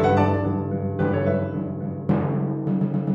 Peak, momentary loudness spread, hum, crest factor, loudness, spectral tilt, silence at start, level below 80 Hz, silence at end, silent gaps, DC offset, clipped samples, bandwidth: -6 dBFS; 7 LU; none; 16 dB; -24 LUFS; -10 dB/octave; 0 s; -52 dBFS; 0 s; none; under 0.1%; under 0.1%; 7.6 kHz